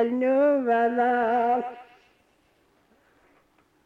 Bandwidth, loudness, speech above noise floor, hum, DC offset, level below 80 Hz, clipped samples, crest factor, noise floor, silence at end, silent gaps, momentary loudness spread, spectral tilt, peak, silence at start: 6 kHz; -23 LUFS; 42 dB; none; under 0.1%; -72 dBFS; under 0.1%; 12 dB; -65 dBFS; 2.05 s; none; 5 LU; -6.5 dB/octave; -14 dBFS; 0 s